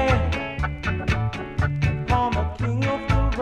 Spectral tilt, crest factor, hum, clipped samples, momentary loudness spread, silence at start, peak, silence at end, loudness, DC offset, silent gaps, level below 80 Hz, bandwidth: -7 dB/octave; 16 dB; none; under 0.1%; 5 LU; 0 s; -8 dBFS; 0 s; -24 LUFS; under 0.1%; none; -30 dBFS; 9.6 kHz